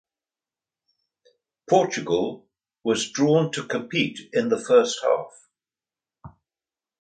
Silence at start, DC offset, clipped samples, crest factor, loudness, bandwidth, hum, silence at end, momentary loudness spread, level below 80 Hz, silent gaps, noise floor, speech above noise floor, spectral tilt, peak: 1.7 s; under 0.1%; under 0.1%; 20 dB; -23 LUFS; 9.4 kHz; none; 0.7 s; 10 LU; -66 dBFS; none; under -90 dBFS; over 68 dB; -4.5 dB/octave; -4 dBFS